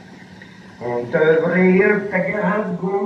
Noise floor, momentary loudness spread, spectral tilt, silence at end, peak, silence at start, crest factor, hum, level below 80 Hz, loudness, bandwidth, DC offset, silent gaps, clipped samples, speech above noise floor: -40 dBFS; 11 LU; -8.5 dB/octave; 0 s; -4 dBFS; 0.05 s; 14 dB; none; -60 dBFS; -17 LUFS; 6.6 kHz; under 0.1%; none; under 0.1%; 23 dB